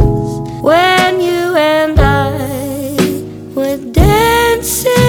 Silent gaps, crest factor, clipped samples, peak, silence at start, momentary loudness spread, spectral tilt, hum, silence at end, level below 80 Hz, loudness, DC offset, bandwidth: none; 12 dB; under 0.1%; 0 dBFS; 0 s; 10 LU; -5 dB/octave; none; 0 s; -22 dBFS; -12 LUFS; under 0.1%; over 20 kHz